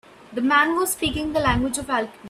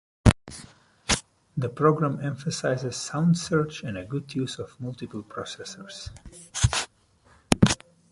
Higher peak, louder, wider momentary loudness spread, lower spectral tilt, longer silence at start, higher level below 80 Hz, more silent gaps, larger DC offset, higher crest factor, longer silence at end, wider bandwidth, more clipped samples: second, -6 dBFS vs -2 dBFS; first, -21 LUFS vs -27 LUFS; second, 8 LU vs 16 LU; second, -3.5 dB/octave vs -5 dB/octave; about the same, 0.3 s vs 0.25 s; about the same, -40 dBFS vs -40 dBFS; neither; neither; second, 18 dB vs 26 dB; second, 0 s vs 0.35 s; first, 15.5 kHz vs 11.5 kHz; neither